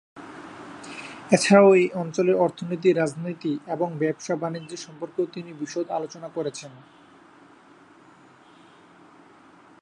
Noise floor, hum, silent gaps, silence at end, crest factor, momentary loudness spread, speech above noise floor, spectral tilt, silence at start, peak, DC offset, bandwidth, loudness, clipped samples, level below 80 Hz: -52 dBFS; none; none; 3.1 s; 24 dB; 23 LU; 29 dB; -5.5 dB/octave; 0.15 s; -2 dBFS; under 0.1%; 11 kHz; -23 LUFS; under 0.1%; -72 dBFS